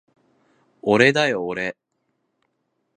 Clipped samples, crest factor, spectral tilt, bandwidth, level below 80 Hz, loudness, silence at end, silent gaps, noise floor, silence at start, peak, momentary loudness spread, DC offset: under 0.1%; 24 dB; -5 dB/octave; 10 kHz; -64 dBFS; -20 LUFS; 1.25 s; none; -73 dBFS; 0.85 s; 0 dBFS; 13 LU; under 0.1%